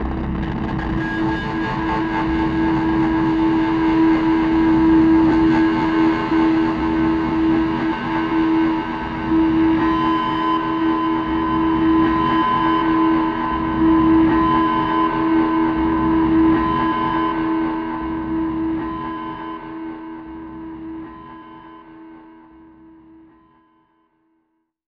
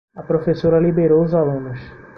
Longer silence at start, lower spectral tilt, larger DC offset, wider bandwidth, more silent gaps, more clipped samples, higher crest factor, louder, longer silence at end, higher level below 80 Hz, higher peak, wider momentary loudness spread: second, 0 s vs 0.15 s; second, -8 dB/octave vs -10.5 dB/octave; neither; second, 5.2 kHz vs 5.8 kHz; neither; neither; about the same, 12 dB vs 14 dB; about the same, -18 LUFS vs -17 LUFS; first, 2.6 s vs 0.1 s; first, -36 dBFS vs -46 dBFS; about the same, -6 dBFS vs -4 dBFS; about the same, 14 LU vs 13 LU